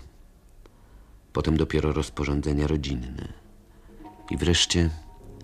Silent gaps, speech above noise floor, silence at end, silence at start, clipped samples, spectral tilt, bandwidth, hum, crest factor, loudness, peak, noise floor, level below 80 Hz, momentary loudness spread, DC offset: none; 27 dB; 0 s; 0 s; under 0.1%; -4.5 dB/octave; 12.5 kHz; none; 20 dB; -26 LUFS; -8 dBFS; -52 dBFS; -36 dBFS; 20 LU; under 0.1%